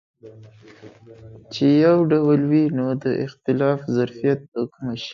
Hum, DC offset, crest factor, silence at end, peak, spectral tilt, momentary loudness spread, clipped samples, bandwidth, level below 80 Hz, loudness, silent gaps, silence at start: none; under 0.1%; 16 dB; 0 s; -6 dBFS; -8 dB/octave; 12 LU; under 0.1%; 7 kHz; -62 dBFS; -20 LUFS; 4.48-4.52 s; 0.25 s